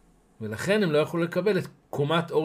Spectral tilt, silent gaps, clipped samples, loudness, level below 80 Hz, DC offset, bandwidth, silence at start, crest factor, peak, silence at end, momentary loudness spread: -6 dB/octave; none; under 0.1%; -26 LUFS; -66 dBFS; under 0.1%; 15.5 kHz; 0.4 s; 16 dB; -10 dBFS; 0 s; 13 LU